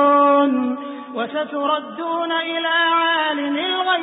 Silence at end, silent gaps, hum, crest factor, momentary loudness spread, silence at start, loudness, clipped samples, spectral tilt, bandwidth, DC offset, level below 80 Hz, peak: 0 s; none; none; 14 dB; 10 LU; 0 s; -19 LUFS; under 0.1%; -8 dB/octave; 4 kHz; under 0.1%; -74 dBFS; -6 dBFS